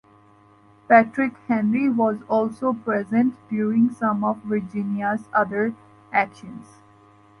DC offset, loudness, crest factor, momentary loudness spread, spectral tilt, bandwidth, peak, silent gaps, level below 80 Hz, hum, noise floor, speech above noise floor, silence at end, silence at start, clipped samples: under 0.1%; -22 LUFS; 20 dB; 10 LU; -8.5 dB/octave; 10.5 kHz; -4 dBFS; none; -66 dBFS; none; -53 dBFS; 32 dB; 0.75 s; 0.9 s; under 0.1%